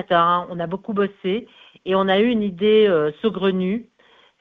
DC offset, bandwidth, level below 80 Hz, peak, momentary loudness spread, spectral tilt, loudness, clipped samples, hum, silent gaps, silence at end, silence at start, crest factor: under 0.1%; 4.5 kHz; -58 dBFS; -4 dBFS; 12 LU; -8.5 dB/octave; -20 LUFS; under 0.1%; none; none; 0.6 s; 0 s; 16 dB